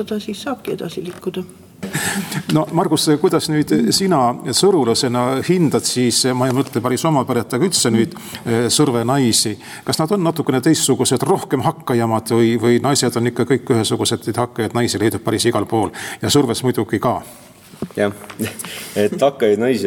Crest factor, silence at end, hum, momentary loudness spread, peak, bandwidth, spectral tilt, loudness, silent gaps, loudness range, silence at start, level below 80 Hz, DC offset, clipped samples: 14 dB; 0 s; none; 11 LU; -4 dBFS; 18.5 kHz; -4.5 dB/octave; -17 LUFS; none; 4 LU; 0 s; -56 dBFS; under 0.1%; under 0.1%